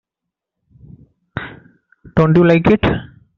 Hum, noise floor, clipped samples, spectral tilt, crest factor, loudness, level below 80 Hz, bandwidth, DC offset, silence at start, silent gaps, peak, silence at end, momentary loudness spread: none; -82 dBFS; under 0.1%; -7 dB/octave; 16 dB; -14 LUFS; -40 dBFS; 6.2 kHz; under 0.1%; 1.35 s; none; -2 dBFS; 0.35 s; 19 LU